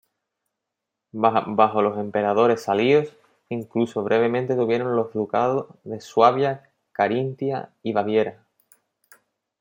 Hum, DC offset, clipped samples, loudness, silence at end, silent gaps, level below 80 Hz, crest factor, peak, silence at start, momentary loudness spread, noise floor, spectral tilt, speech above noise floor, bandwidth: none; under 0.1%; under 0.1%; -22 LUFS; 1.3 s; none; -70 dBFS; 20 dB; -2 dBFS; 1.15 s; 13 LU; -83 dBFS; -7 dB/octave; 62 dB; 16.5 kHz